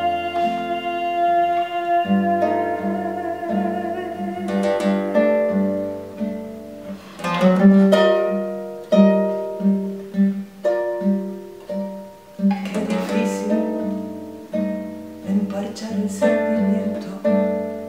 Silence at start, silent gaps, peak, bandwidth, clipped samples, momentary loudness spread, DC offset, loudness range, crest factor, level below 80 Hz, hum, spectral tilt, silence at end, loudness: 0 s; none; -2 dBFS; 15 kHz; under 0.1%; 13 LU; 0.1%; 6 LU; 18 dB; -60 dBFS; none; -7 dB/octave; 0 s; -21 LUFS